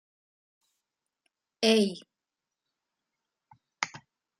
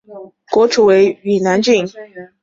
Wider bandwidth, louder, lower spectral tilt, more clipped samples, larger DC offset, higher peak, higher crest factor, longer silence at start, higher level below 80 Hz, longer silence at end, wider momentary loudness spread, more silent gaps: first, 13.5 kHz vs 7.8 kHz; second, -28 LUFS vs -13 LUFS; about the same, -4 dB/octave vs -5 dB/octave; neither; neither; second, -8 dBFS vs -2 dBFS; first, 26 dB vs 12 dB; first, 1.6 s vs 0.1 s; second, -80 dBFS vs -56 dBFS; first, 0.4 s vs 0.2 s; about the same, 12 LU vs 10 LU; neither